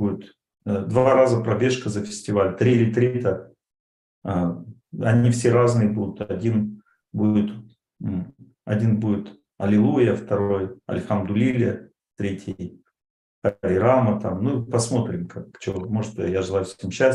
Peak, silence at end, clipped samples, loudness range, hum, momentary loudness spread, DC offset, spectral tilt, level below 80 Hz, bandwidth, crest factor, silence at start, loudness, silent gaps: -4 dBFS; 0 s; under 0.1%; 4 LU; none; 15 LU; under 0.1%; -7 dB/octave; -60 dBFS; 11 kHz; 18 dB; 0 s; -22 LUFS; 3.80-4.22 s, 13.10-13.42 s